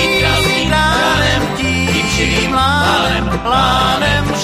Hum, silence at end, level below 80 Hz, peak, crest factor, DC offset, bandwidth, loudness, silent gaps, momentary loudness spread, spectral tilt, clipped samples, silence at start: none; 0 s; -26 dBFS; 0 dBFS; 14 dB; under 0.1%; 15.5 kHz; -13 LUFS; none; 3 LU; -4 dB/octave; under 0.1%; 0 s